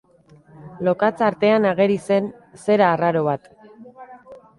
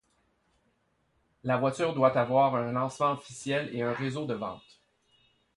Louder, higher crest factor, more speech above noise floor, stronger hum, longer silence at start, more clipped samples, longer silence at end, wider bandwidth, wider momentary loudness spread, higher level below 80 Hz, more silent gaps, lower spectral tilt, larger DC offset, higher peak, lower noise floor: first, -19 LUFS vs -29 LUFS; about the same, 18 dB vs 22 dB; second, 33 dB vs 44 dB; neither; second, 0.6 s vs 1.45 s; neither; second, 0.25 s vs 1 s; about the same, 11.5 kHz vs 11.5 kHz; about the same, 9 LU vs 11 LU; about the same, -64 dBFS vs -68 dBFS; neither; about the same, -7 dB/octave vs -6 dB/octave; neither; first, -2 dBFS vs -10 dBFS; second, -51 dBFS vs -73 dBFS